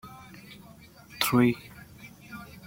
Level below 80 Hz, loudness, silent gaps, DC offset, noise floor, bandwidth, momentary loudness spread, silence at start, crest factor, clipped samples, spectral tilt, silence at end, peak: -60 dBFS; -26 LUFS; none; under 0.1%; -51 dBFS; 16.5 kHz; 25 LU; 0.05 s; 22 dB; under 0.1%; -5 dB/octave; 0.05 s; -10 dBFS